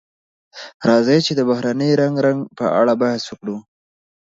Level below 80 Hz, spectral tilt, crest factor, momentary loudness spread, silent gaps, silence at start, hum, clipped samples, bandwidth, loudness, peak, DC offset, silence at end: -64 dBFS; -6 dB/octave; 18 dB; 14 LU; 0.74-0.80 s; 0.55 s; none; under 0.1%; 7.8 kHz; -17 LUFS; 0 dBFS; under 0.1%; 0.7 s